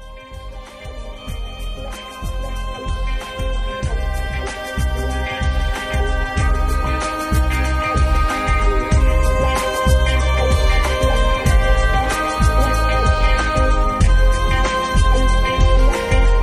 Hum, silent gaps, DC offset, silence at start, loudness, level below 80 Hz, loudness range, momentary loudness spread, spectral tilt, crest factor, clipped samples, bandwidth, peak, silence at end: none; none; under 0.1%; 0 s; -18 LUFS; -18 dBFS; 9 LU; 14 LU; -5 dB/octave; 14 dB; under 0.1%; 14 kHz; -2 dBFS; 0 s